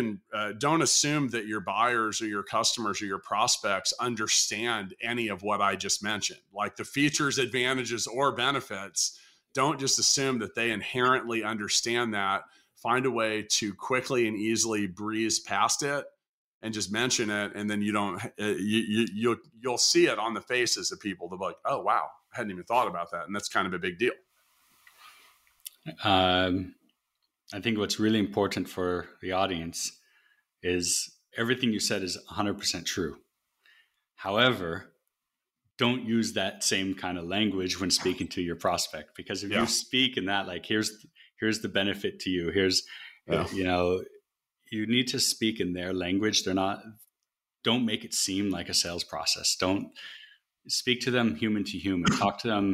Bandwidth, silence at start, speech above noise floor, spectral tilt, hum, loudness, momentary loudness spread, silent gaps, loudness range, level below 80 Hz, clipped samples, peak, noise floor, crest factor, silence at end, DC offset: 16 kHz; 0 s; 58 dB; -3 dB/octave; none; -28 LUFS; 9 LU; 16.29-16.61 s; 4 LU; -64 dBFS; under 0.1%; -8 dBFS; -87 dBFS; 22 dB; 0 s; under 0.1%